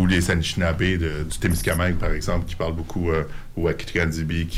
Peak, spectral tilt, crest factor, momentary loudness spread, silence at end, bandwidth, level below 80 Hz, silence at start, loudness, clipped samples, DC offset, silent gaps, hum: -10 dBFS; -5.5 dB/octave; 12 dB; 5 LU; 0 s; 15.5 kHz; -30 dBFS; 0 s; -24 LUFS; under 0.1%; under 0.1%; none; none